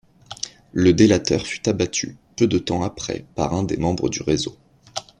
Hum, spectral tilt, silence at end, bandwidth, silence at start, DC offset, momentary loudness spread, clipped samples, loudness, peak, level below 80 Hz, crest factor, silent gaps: none; -5 dB/octave; 0.2 s; 10.5 kHz; 0.3 s; under 0.1%; 16 LU; under 0.1%; -21 LUFS; -2 dBFS; -46 dBFS; 20 dB; none